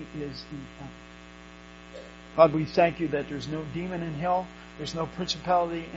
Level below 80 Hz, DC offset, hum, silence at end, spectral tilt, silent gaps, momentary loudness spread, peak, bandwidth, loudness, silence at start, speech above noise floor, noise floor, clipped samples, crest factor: -52 dBFS; under 0.1%; 60 Hz at -50 dBFS; 0 s; -4.5 dB/octave; none; 25 LU; -4 dBFS; 8 kHz; -27 LUFS; 0 s; 19 dB; -47 dBFS; under 0.1%; 24 dB